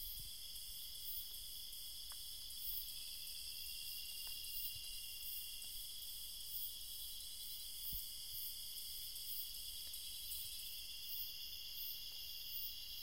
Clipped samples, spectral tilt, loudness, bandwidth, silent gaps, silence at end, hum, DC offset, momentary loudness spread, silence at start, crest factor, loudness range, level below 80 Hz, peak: under 0.1%; 1 dB/octave; -46 LUFS; 16 kHz; none; 0 s; none; 0.2%; 4 LU; 0 s; 18 dB; 1 LU; -64 dBFS; -30 dBFS